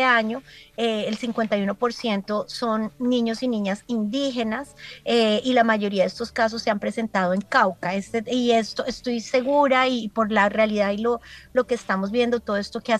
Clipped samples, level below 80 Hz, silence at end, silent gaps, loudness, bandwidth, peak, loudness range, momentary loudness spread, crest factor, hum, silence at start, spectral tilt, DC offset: under 0.1%; -58 dBFS; 0 s; none; -23 LUFS; 12.5 kHz; -4 dBFS; 3 LU; 8 LU; 18 dB; none; 0 s; -5 dB/octave; under 0.1%